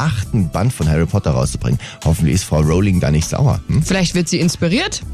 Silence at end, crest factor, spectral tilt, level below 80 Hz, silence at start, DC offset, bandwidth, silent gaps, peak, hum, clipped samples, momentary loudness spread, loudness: 0 s; 10 dB; -5.5 dB/octave; -28 dBFS; 0 s; under 0.1%; 14 kHz; none; -4 dBFS; none; under 0.1%; 4 LU; -16 LUFS